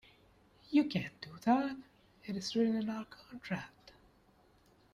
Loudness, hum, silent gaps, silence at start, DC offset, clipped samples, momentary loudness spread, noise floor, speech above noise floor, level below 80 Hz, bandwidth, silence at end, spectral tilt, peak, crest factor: -35 LUFS; none; none; 0.7 s; under 0.1%; under 0.1%; 18 LU; -67 dBFS; 32 dB; -72 dBFS; 13 kHz; 1.05 s; -6 dB/octave; -18 dBFS; 20 dB